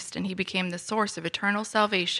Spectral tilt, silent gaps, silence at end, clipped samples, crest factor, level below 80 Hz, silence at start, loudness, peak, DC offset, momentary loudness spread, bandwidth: -3.5 dB/octave; none; 0 s; under 0.1%; 20 dB; -70 dBFS; 0 s; -27 LUFS; -8 dBFS; under 0.1%; 5 LU; 12.5 kHz